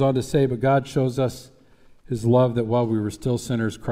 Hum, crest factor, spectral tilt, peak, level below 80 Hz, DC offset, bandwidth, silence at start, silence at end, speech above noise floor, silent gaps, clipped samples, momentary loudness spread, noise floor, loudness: none; 14 dB; -7 dB/octave; -8 dBFS; -48 dBFS; under 0.1%; 15 kHz; 0 s; 0 s; 30 dB; none; under 0.1%; 7 LU; -51 dBFS; -22 LUFS